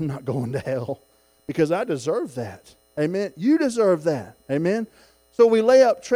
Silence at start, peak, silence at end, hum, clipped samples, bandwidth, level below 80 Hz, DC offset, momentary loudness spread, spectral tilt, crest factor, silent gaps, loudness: 0 s; -4 dBFS; 0 s; none; under 0.1%; 16 kHz; -62 dBFS; under 0.1%; 19 LU; -6.5 dB/octave; 18 dB; none; -22 LUFS